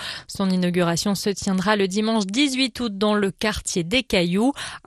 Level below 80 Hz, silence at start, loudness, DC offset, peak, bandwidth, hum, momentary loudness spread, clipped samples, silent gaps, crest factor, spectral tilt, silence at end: -46 dBFS; 0 s; -22 LUFS; under 0.1%; -4 dBFS; 13.5 kHz; none; 4 LU; under 0.1%; none; 18 dB; -4.5 dB/octave; 0.1 s